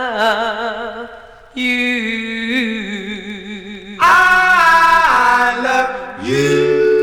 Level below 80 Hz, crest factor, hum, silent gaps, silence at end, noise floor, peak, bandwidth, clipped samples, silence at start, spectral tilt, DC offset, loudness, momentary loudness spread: -44 dBFS; 14 dB; none; none; 0 s; -37 dBFS; -2 dBFS; 18.5 kHz; under 0.1%; 0 s; -4 dB/octave; 0.2%; -13 LUFS; 19 LU